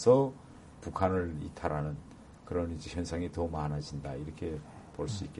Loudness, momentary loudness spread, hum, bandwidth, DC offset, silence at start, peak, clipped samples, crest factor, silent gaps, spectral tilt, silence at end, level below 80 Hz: -35 LUFS; 15 LU; none; 11.5 kHz; under 0.1%; 0 s; -12 dBFS; under 0.1%; 22 dB; none; -7 dB/octave; 0 s; -50 dBFS